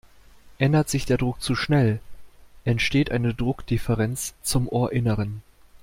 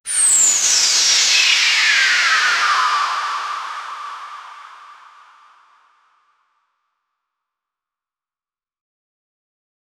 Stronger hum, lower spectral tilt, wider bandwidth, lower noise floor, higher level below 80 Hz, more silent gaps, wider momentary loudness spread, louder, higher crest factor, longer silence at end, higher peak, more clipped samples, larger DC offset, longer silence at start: neither; first, -5.5 dB/octave vs 4.5 dB/octave; about the same, 16.5 kHz vs 16.5 kHz; second, -49 dBFS vs under -90 dBFS; first, -42 dBFS vs -68 dBFS; neither; second, 7 LU vs 19 LU; second, -24 LUFS vs -13 LUFS; about the same, 18 dB vs 16 dB; second, 0.05 s vs 5.05 s; second, -6 dBFS vs -2 dBFS; neither; neither; first, 0.45 s vs 0.05 s